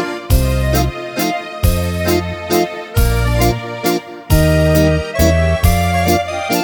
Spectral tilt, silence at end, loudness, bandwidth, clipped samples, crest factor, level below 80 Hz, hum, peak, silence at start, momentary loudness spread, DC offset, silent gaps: -5.5 dB/octave; 0 s; -15 LUFS; over 20 kHz; under 0.1%; 14 dB; -20 dBFS; none; 0 dBFS; 0 s; 6 LU; under 0.1%; none